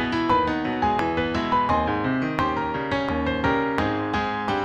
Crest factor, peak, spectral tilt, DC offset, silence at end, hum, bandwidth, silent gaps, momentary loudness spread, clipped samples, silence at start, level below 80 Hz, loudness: 20 dB; -4 dBFS; -6.5 dB/octave; under 0.1%; 0 s; none; 9 kHz; none; 4 LU; under 0.1%; 0 s; -42 dBFS; -23 LUFS